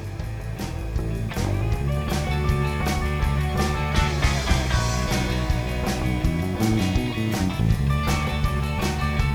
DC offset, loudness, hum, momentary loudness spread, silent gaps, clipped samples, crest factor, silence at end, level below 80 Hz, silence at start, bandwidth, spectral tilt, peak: under 0.1%; -24 LUFS; none; 6 LU; none; under 0.1%; 16 dB; 0 s; -28 dBFS; 0 s; 19 kHz; -5.5 dB/octave; -6 dBFS